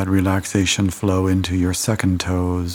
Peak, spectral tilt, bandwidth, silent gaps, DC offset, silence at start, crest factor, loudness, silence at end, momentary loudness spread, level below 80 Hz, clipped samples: -2 dBFS; -5 dB/octave; 17.5 kHz; none; under 0.1%; 0 s; 16 dB; -19 LUFS; 0 s; 2 LU; -40 dBFS; under 0.1%